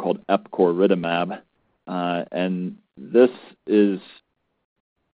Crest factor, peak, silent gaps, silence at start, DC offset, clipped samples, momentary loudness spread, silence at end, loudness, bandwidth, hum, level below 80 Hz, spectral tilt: 20 dB; -4 dBFS; none; 0 s; under 0.1%; under 0.1%; 15 LU; 1.15 s; -22 LUFS; 5 kHz; none; -68 dBFS; -5.5 dB/octave